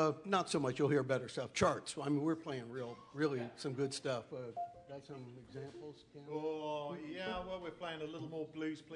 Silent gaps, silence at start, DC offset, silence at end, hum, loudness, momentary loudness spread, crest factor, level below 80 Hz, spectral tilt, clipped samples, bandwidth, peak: none; 0 s; under 0.1%; 0 s; none; -40 LUFS; 16 LU; 24 dB; -70 dBFS; -5.5 dB/octave; under 0.1%; 11 kHz; -16 dBFS